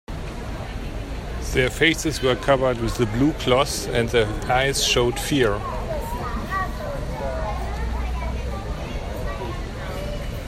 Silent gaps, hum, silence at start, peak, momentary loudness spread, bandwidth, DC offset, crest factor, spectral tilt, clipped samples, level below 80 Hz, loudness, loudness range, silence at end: none; none; 0.1 s; -4 dBFS; 13 LU; 16 kHz; under 0.1%; 20 dB; -4.5 dB/octave; under 0.1%; -30 dBFS; -24 LUFS; 8 LU; 0 s